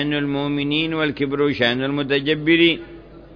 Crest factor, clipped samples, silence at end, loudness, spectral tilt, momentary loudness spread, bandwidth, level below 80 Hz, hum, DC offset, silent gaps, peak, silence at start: 16 dB; under 0.1%; 0 s; -19 LUFS; -7.5 dB/octave; 7 LU; 5.4 kHz; -48 dBFS; none; under 0.1%; none; -4 dBFS; 0 s